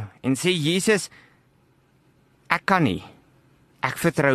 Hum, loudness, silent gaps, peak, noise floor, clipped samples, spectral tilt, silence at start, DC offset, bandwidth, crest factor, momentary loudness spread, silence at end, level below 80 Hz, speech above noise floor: none; -23 LUFS; none; -2 dBFS; -61 dBFS; under 0.1%; -4.5 dB/octave; 0 s; under 0.1%; 13 kHz; 24 dB; 9 LU; 0 s; -58 dBFS; 39 dB